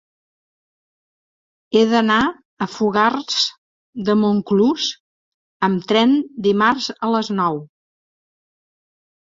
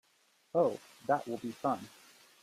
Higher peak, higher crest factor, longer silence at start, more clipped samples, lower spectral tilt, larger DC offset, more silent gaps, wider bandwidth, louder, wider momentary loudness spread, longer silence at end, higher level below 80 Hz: first, -2 dBFS vs -16 dBFS; about the same, 18 dB vs 20 dB; first, 1.7 s vs 0.55 s; neither; about the same, -5 dB/octave vs -6 dB/octave; neither; first, 2.45-2.57 s, 3.58-3.93 s, 5.00-5.60 s vs none; second, 7.6 kHz vs 15.5 kHz; first, -18 LUFS vs -35 LUFS; about the same, 9 LU vs 10 LU; first, 1.6 s vs 0.55 s; first, -58 dBFS vs -80 dBFS